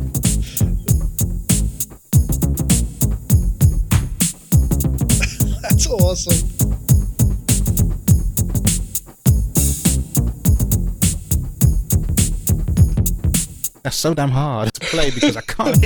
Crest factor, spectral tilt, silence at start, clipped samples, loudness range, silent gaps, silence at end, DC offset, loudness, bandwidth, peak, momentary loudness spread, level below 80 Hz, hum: 16 dB; -5 dB/octave; 0 s; under 0.1%; 1 LU; none; 0 s; under 0.1%; -18 LUFS; 19.5 kHz; 0 dBFS; 5 LU; -22 dBFS; none